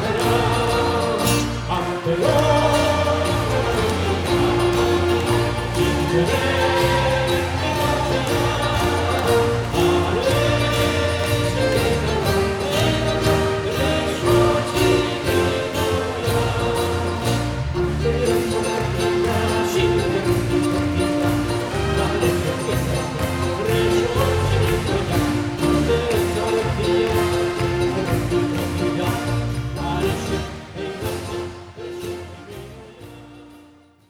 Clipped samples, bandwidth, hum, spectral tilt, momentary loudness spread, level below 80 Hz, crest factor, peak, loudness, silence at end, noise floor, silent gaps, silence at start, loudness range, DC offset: under 0.1%; 19 kHz; none; -5.5 dB/octave; 6 LU; -34 dBFS; 16 dB; -4 dBFS; -20 LUFS; 0.5 s; -49 dBFS; none; 0 s; 4 LU; under 0.1%